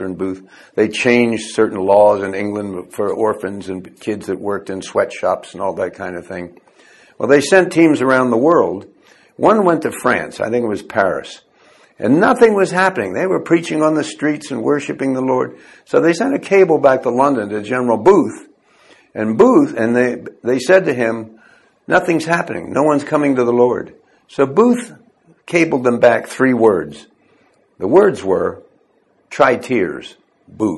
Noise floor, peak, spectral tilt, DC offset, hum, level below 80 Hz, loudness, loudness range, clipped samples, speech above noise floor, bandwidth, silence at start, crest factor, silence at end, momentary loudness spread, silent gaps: -58 dBFS; 0 dBFS; -6 dB/octave; under 0.1%; none; -54 dBFS; -15 LUFS; 4 LU; under 0.1%; 43 dB; 12.5 kHz; 0 s; 16 dB; 0 s; 14 LU; none